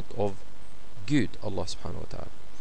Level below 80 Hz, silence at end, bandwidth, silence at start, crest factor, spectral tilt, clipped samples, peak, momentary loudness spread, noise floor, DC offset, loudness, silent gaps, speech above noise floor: -50 dBFS; 0 s; 10.5 kHz; 0 s; 20 dB; -6 dB/octave; under 0.1%; -12 dBFS; 23 LU; -51 dBFS; 6%; -33 LUFS; none; 20 dB